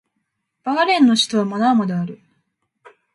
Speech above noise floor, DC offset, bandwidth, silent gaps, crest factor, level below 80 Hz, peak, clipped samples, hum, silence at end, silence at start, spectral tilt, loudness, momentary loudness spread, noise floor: 57 dB; under 0.1%; 11.5 kHz; none; 16 dB; -68 dBFS; -4 dBFS; under 0.1%; none; 1 s; 0.65 s; -4.5 dB/octave; -17 LUFS; 13 LU; -74 dBFS